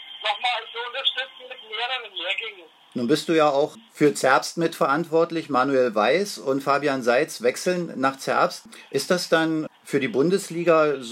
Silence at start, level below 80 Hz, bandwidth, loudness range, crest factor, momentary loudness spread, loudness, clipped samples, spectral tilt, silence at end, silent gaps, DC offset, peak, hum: 0 s; -80 dBFS; 16 kHz; 3 LU; 20 dB; 9 LU; -23 LUFS; under 0.1%; -4 dB/octave; 0 s; none; under 0.1%; -4 dBFS; none